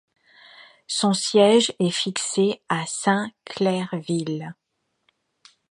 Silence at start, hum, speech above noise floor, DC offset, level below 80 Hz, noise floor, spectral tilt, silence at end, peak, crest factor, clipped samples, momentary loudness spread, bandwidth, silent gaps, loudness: 0.6 s; none; 47 dB; under 0.1%; -72 dBFS; -69 dBFS; -4 dB/octave; 1.2 s; -4 dBFS; 20 dB; under 0.1%; 12 LU; 11.5 kHz; none; -22 LUFS